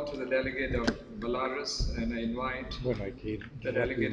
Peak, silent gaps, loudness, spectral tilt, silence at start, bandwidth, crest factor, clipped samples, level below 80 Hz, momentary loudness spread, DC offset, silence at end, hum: -12 dBFS; none; -33 LUFS; -5 dB/octave; 0 s; 10.5 kHz; 20 dB; under 0.1%; -42 dBFS; 6 LU; under 0.1%; 0 s; none